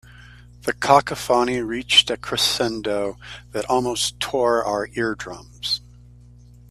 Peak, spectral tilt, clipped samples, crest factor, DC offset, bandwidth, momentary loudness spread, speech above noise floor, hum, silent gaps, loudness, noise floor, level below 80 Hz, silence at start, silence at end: 0 dBFS; -2.5 dB/octave; under 0.1%; 22 dB; under 0.1%; 15.5 kHz; 15 LU; 25 dB; 60 Hz at -45 dBFS; none; -21 LUFS; -46 dBFS; -48 dBFS; 0.2 s; 0.9 s